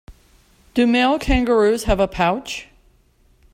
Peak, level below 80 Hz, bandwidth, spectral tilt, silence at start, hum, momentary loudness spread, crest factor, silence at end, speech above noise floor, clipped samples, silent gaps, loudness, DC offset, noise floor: -4 dBFS; -32 dBFS; 15.5 kHz; -5 dB/octave; 0.1 s; none; 10 LU; 16 dB; 0.9 s; 39 dB; under 0.1%; none; -18 LUFS; under 0.1%; -56 dBFS